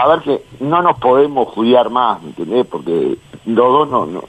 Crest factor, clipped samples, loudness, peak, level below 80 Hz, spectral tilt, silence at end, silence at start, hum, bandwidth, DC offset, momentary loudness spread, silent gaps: 14 dB; under 0.1%; -14 LUFS; 0 dBFS; -52 dBFS; -7 dB/octave; 0.05 s; 0 s; none; 9 kHz; under 0.1%; 8 LU; none